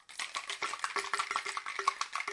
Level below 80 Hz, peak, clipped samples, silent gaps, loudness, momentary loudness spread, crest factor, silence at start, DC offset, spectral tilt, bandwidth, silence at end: -80 dBFS; -14 dBFS; under 0.1%; none; -35 LUFS; 4 LU; 24 dB; 0.1 s; under 0.1%; 1.5 dB/octave; 11.5 kHz; 0 s